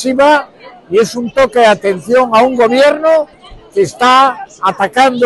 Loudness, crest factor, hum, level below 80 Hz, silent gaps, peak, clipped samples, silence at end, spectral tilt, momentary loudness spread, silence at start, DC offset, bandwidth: -11 LUFS; 10 dB; none; -48 dBFS; none; 0 dBFS; under 0.1%; 0 s; -4 dB/octave; 7 LU; 0 s; under 0.1%; 12.5 kHz